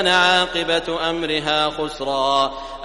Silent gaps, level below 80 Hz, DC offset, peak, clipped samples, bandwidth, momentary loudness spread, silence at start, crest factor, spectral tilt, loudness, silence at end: none; -44 dBFS; under 0.1%; -2 dBFS; under 0.1%; 11.5 kHz; 8 LU; 0 s; 18 dB; -3 dB/octave; -19 LUFS; 0 s